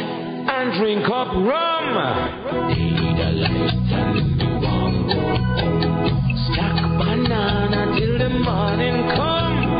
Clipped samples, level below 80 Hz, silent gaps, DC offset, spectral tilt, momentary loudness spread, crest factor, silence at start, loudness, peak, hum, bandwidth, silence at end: under 0.1%; -32 dBFS; none; under 0.1%; -12 dB/octave; 2 LU; 14 dB; 0 s; -20 LUFS; -4 dBFS; none; 5.2 kHz; 0 s